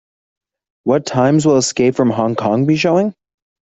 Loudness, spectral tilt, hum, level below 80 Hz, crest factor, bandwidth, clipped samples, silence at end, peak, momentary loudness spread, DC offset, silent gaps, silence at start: -15 LUFS; -5.5 dB/octave; none; -54 dBFS; 14 dB; 8.2 kHz; under 0.1%; 0.6 s; -2 dBFS; 5 LU; under 0.1%; none; 0.85 s